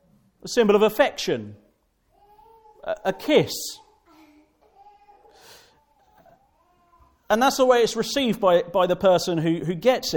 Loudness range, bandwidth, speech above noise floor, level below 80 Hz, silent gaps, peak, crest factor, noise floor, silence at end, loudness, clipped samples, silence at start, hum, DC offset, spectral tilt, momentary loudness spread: 8 LU; 18 kHz; 44 dB; -58 dBFS; none; -4 dBFS; 20 dB; -65 dBFS; 0 s; -21 LUFS; under 0.1%; 0.45 s; none; under 0.1%; -4.5 dB/octave; 13 LU